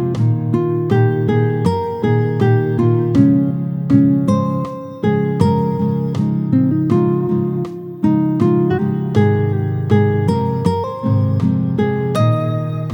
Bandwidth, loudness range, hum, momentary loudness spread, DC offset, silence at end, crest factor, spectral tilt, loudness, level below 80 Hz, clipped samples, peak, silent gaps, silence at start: 18 kHz; 2 LU; none; 5 LU; under 0.1%; 0 s; 14 dB; -9.5 dB/octave; -16 LUFS; -48 dBFS; under 0.1%; 0 dBFS; none; 0 s